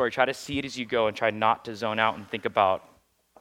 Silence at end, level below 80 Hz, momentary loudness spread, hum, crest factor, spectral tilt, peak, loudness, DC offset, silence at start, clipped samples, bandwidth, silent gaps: 0.6 s; -62 dBFS; 7 LU; none; 22 dB; -4.5 dB/octave; -6 dBFS; -26 LUFS; under 0.1%; 0 s; under 0.1%; 16 kHz; none